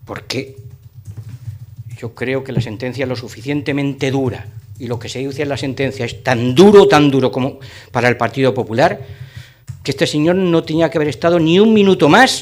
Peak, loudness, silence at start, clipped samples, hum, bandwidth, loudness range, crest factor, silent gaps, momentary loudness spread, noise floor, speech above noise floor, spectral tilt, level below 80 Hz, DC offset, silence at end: 0 dBFS; -15 LUFS; 0.1 s; under 0.1%; none; 16 kHz; 10 LU; 16 dB; none; 23 LU; -35 dBFS; 21 dB; -6 dB/octave; -48 dBFS; under 0.1%; 0 s